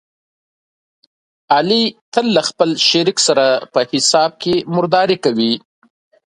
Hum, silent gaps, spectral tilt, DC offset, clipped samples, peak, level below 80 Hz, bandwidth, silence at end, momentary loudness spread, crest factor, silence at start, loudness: none; 2.01-2.12 s; -3.5 dB/octave; under 0.1%; under 0.1%; 0 dBFS; -62 dBFS; 11.5 kHz; 0.75 s; 5 LU; 16 dB; 1.5 s; -15 LUFS